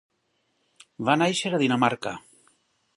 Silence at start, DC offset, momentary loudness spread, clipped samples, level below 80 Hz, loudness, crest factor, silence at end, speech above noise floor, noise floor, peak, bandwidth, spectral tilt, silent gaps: 1 s; under 0.1%; 12 LU; under 0.1%; -70 dBFS; -24 LUFS; 22 dB; 0.75 s; 49 dB; -73 dBFS; -6 dBFS; 11.5 kHz; -4.5 dB/octave; none